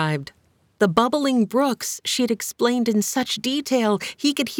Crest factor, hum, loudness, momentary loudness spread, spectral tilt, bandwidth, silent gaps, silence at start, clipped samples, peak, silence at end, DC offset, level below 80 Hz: 18 dB; none; -22 LUFS; 4 LU; -4 dB/octave; 19.5 kHz; none; 0 s; under 0.1%; -4 dBFS; 0 s; under 0.1%; -64 dBFS